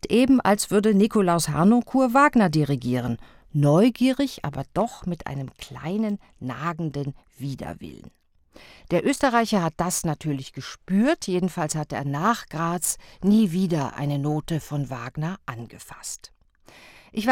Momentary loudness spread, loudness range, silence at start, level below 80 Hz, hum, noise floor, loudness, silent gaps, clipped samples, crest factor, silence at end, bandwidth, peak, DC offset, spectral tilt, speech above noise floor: 16 LU; 10 LU; 0.05 s; -52 dBFS; none; -53 dBFS; -23 LUFS; none; under 0.1%; 20 dB; 0 s; 17 kHz; -4 dBFS; under 0.1%; -5.5 dB/octave; 30 dB